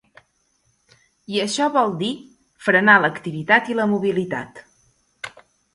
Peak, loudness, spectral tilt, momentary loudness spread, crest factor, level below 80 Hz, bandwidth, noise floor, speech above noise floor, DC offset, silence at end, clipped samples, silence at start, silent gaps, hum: 0 dBFS; -19 LUFS; -4.5 dB/octave; 22 LU; 22 dB; -64 dBFS; 11.5 kHz; -66 dBFS; 47 dB; under 0.1%; 0.45 s; under 0.1%; 1.3 s; none; none